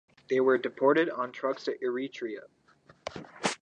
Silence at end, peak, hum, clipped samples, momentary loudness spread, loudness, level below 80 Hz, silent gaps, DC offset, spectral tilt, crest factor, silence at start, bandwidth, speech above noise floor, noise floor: 0.05 s; -10 dBFS; none; under 0.1%; 17 LU; -29 LUFS; -72 dBFS; none; under 0.1%; -4.5 dB/octave; 20 dB; 0.3 s; 11 kHz; 33 dB; -61 dBFS